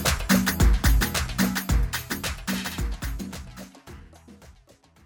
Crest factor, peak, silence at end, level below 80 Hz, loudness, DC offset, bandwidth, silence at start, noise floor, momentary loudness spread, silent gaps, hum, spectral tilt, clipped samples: 18 dB; -8 dBFS; 0.55 s; -28 dBFS; -25 LUFS; under 0.1%; over 20 kHz; 0 s; -56 dBFS; 21 LU; none; none; -4 dB/octave; under 0.1%